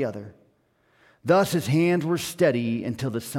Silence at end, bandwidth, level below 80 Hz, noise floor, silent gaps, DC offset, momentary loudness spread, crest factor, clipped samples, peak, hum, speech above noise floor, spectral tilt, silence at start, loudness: 0 s; 17 kHz; -62 dBFS; -65 dBFS; none; under 0.1%; 10 LU; 18 dB; under 0.1%; -8 dBFS; none; 41 dB; -6 dB/octave; 0 s; -24 LUFS